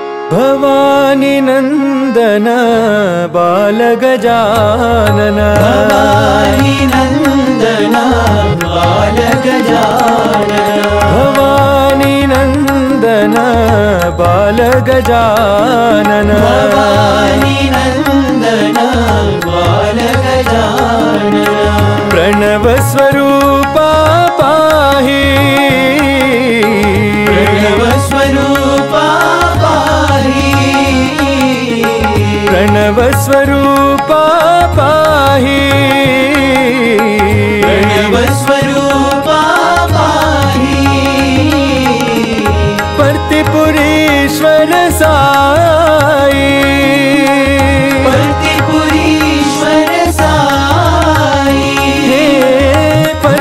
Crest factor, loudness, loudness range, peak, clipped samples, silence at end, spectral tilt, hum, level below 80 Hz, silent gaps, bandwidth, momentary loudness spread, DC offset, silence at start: 8 dB; -8 LUFS; 2 LU; 0 dBFS; under 0.1%; 0 s; -5.5 dB/octave; none; -26 dBFS; none; 16.5 kHz; 3 LU; 0.3%; 0 s